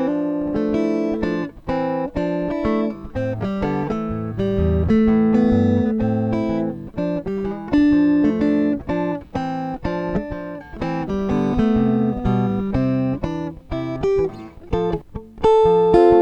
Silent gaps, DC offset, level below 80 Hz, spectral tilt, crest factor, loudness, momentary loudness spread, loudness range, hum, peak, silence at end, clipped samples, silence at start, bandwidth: none; under 0.1%; -36 dBFS; -9 dB/octave; 18 dB; -20 LUFS; 11 LU; 4 LU; none; -2 dBFS; 0 s; under 0.1%; 0 s; 8 kHz